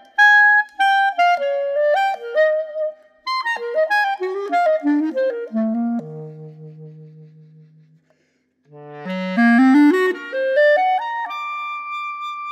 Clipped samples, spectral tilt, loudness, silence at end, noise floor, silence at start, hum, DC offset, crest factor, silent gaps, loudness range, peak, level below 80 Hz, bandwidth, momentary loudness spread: under 0.1%; -5.5 dB/octave; -18 LUFS; 0 s; -65 dBFS; 0.2 s; none; under 0.1%; 16 dB; none; 11 LU; -2 dBFS; -84 dBFS; 13 kHz; 15 LU